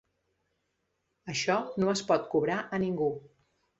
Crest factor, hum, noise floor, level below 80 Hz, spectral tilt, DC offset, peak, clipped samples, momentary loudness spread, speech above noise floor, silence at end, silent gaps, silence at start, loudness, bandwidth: 20 dB; none; -79 dBFS; -68 dBFS; -5 dB/octave; under 0.1%; -12 dBFS; under 0.1%; 8 LU; 50 dB; 0.6 s; none; 1.25 s; -30 LUFS; 8.2 kHz